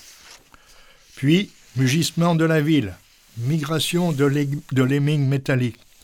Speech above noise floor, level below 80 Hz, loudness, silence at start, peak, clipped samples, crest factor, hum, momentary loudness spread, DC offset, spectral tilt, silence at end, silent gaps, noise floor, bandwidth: 30 dB; -56 dBFS; -21 LUFS; 0.3 s; -6 dBFS; under 0.1%; 16 dB; none; 7 LU; under 0.1%; -6 dB/octave; 0.3 s; none; -50 dBFS; 17 kHz